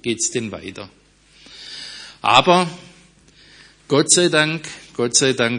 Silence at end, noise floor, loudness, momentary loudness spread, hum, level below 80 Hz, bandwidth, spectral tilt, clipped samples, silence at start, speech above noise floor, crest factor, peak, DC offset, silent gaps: 0 s; -50 dBFS; -16 LUFS; 21 LU; none; -58 dBFS; 10.5 kHz; -2.5 dB/octave; under 0.1%; 0.05 s; 32 dB; 20 dB; 0 dBFS; under 0.1%; none